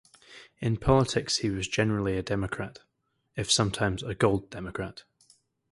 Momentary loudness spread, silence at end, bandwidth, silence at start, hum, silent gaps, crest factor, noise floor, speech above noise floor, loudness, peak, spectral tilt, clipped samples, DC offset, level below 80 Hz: 13 LU; 0.7 s; 11.5 kHz; 0.3 s; none; none; 22 dB; -64 dBFS; 36 dB; -28 LUFS; -8 dBFS; -4.5 dB/octave; under 0.1%; under 0.1%; -48 dBFS